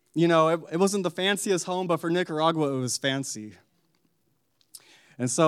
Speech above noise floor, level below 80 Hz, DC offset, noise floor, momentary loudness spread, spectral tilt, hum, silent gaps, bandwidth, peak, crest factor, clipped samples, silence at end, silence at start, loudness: 48 dB; -84 dBFS; under 0.1%; -73 dBFS; 10 LU; -4.5 dB/octave; none; none; 15 kHz; -8 dBFS; 18 dB; under 0.1%; 0 s; 0.15 s; -25 LUFS